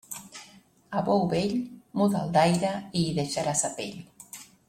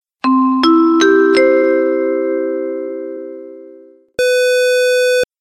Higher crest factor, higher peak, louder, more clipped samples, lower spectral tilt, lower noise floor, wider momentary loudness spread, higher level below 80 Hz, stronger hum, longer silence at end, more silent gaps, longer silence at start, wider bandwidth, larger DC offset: first, 18 dB vs 12 dB; second, -8 dBFS vs -2 dBFS; second, -27 LUFS vs -13 LUFS; neither; first, -5 dB/octave vs -2.5 dB/octave; first, -55 dBFS vs -41 dBFS; first, 20 LU vs 16 LU; about the same, -60 dBFS vs -58 dBFS; neither; about the same, 0.25 s vs 0.15 s; neither; second, 0.1 s vs 0.25 s; about the same, 16 kHz vs 16.5 kHz; neither